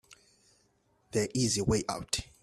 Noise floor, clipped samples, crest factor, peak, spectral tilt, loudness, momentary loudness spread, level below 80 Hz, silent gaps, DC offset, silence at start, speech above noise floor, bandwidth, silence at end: -71 dBFS; under 0.1%; 20 dB; -14 dBFS; -4 dB/octave; -31 LUFS; 6 LU; -52 dBFS; none; under 0.1%; 0.1 s; 40 dB; 14 kHz; 0.2 s